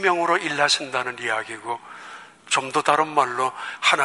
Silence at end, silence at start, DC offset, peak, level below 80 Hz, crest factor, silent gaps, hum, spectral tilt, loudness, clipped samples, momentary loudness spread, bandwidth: 0 s; 0 s; under 0.1%; -2 dBFS; -74 dBFS; 20 dB; none; none; -2 dB/octave; -22 LUFS; under 0.1%; 16 LU; 11.5 kHz